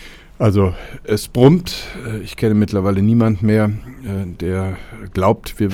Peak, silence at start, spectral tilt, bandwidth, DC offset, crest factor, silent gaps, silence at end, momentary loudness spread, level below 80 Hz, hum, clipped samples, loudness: 0 dBFS; 0 s; -7.5 dB/octave; 16.5 kHz; under 0.1%; 16 dB; none; 0 s; 14 LU; -38 dBFS; none; under 0.1%; -17 LUFS